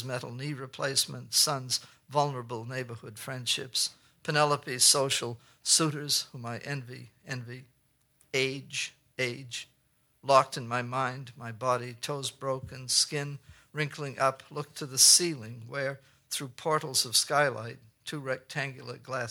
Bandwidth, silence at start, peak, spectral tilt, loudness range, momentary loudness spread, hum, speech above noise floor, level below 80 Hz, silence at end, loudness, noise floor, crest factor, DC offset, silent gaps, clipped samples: over 20 kHz; 0 s; -6 dBFS; -2 dB/octave; 6 LU; 16 LU; none; 40 dB; -72 dBFS; 0 s; -28 LUFS; -70 dBFS; 24 dB; under 0.1%; none; under 0.1%